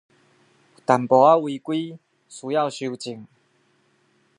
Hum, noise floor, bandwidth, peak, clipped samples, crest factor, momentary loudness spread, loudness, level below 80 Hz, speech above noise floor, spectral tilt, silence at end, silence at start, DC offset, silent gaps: none; -64 dBFS; 11 kHz; -2 dBFS; under 0.1%; 22 dB; 21 LU; -21 LUFS; -76 dBFS; 43 dB; -6 dB/octave; 1.15 s; 0.9 s; under 0.1%; none